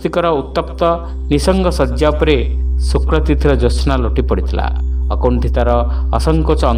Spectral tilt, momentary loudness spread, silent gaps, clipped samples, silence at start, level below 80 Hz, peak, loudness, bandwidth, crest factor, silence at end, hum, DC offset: -7 dB/octave; 5 LU; none; under 0.1%; 0 s; -16 dBFS; 0 dBFS; -15 LUFS; 10.5 kHz; 14 dB; 0 s; none; under 0.1%